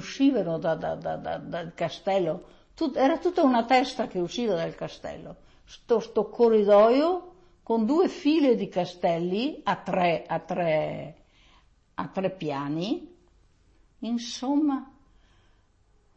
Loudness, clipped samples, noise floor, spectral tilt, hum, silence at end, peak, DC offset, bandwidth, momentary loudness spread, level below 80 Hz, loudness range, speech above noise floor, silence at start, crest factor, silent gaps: -26 LUFS; under 0.1%; -63 dBFS; -6 dB/octave; none; 1.3 s; -10 dBFS; under 0.1%; 8.4 kHz; 13 LU; -60 dBFS; 9 LU; 37 dB; 0 s; 18 dB; none